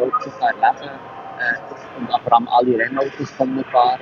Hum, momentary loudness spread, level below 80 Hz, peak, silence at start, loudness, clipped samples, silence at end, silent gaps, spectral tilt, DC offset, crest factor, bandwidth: none; 16 LU; -64 dBFS; 0 dBFS; 0 s; -19 LUFS; under 0.1%; 0 s; none; -6 dB/octave; under 0.1%; 18 dB; 7 kHz